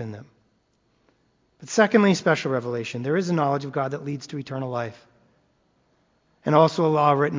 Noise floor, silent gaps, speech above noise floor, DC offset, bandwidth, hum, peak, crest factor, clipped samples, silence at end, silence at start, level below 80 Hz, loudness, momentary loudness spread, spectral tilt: -67 dBFS; none; 45 dB; under 0.1%; 7.6 kHz; none; -2 dBFS; 22 dB; under 0.1%; 0 s; 0 s; -68 dBFS; -23 LUFS; 14 LU; -6 dB/octave